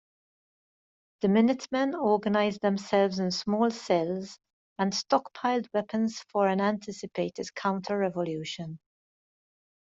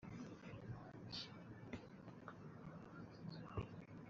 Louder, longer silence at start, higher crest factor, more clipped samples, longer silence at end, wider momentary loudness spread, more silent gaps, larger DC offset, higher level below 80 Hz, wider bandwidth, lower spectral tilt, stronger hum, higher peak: first, -28 LUFS vs -54 LUFS; first, 1.2 s vs 0 s; about the same, 18 dB vs 20 dB; neither; first, 1.2 s vs 0 s; first, 10 LU vs 7 LU; first, 4.53-4.76 s vs none; neither; about the same, -72 dBFS vs -70 dBFS; about the same, 7.8 kHz vs 7.4 kHz; about the same, -5.5 dB/octave vs -5 dB/octave; neither; first, -10 dBFS vs -34 dBFS